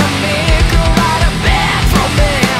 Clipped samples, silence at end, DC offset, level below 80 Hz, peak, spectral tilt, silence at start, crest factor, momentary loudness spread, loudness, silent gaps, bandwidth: under 0.1%; 0 s; under 0.1%; -16 dBFS; 0 dBFS; -4.5 dB/octave; 0 s; 10 dB; 1 LU; -12 LUFS; none; 16 kHz